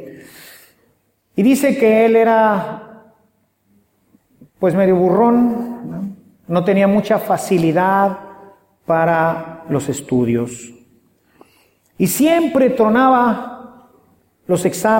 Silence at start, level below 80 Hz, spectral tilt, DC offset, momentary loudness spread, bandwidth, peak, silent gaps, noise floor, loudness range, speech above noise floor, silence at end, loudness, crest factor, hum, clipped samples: 0 s; -56 dBFS; -6 dB/octave; under 0.1%; 16 LU; 17 kHz; -2 dBFS; none; -61 dBFS; 4 LU; 47 dB; 0 s; -15 LUFS; 14 dB; none; under 0.1%